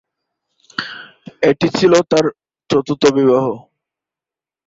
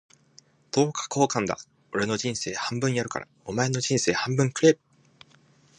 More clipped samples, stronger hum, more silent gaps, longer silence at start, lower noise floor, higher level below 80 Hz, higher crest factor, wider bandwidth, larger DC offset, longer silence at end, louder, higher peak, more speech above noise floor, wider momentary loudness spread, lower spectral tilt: neither; neither; neither; about the same, 0.8 s vs 0.75 s; first, -89 dBFS vs -59 dBFS; first, -56 dBFS vs -62 dBFS; about the same, 16 dB vs 20 dB; second, 8 kHz vs 10.5 kHz; neither; about the same, 1.1 s vs 1.05 s; first, -15 LUFS vs -26 LUFS; first, 0 dBFS vs -6 dBFS; first, 76 dB vs 34 dB; first, 16 LU vs 11 LU; about the same, -5.5 dB/octave vs -4.5 dB/octave